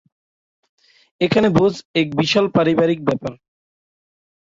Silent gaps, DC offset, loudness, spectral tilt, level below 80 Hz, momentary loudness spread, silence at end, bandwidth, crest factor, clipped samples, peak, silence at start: 1.85-1.94 s; under 0.1%; -18 LUFS; -6 dB/octave; -54 dBFS; 8 LU; 1.15 s; 7.8 kHz; 18 dB; under 0.1%; -2 dBFS; 1.2 s